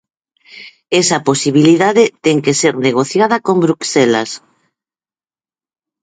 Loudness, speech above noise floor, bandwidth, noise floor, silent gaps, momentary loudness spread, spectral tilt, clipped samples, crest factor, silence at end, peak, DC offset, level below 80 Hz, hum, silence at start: -13 LUFS; over 77 dB; 9.6 kHz; under -90 dBFS; none; 5 LU; -4.5 dB/octave; under 0.1%; 14 dB; 1.65 s; 0 dBFS; under 0.1%; -60 dBFS; none; 0.55 s